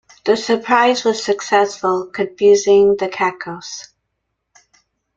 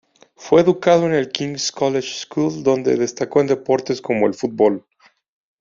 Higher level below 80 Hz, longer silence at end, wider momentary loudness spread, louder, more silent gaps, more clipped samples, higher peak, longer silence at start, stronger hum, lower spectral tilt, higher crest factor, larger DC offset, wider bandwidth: about the same, -60 dBFS vs -60 dBFS; first, 1.35 s vs 0.8 s; first, 16 LU vs 7 LU; about the same, -16 LUFS vs -18 LUFS; neither; neither; about the same, -2 dBFS vs -2 dBFS; second, 0.25 s vs 0.4 s; neither; about the same, -3.5 dB/octave vs -4.5 dB/octave; about the same, 16 dB vs 18 dB; neither; about the same, 7.8 kHz vs 7.6 kHz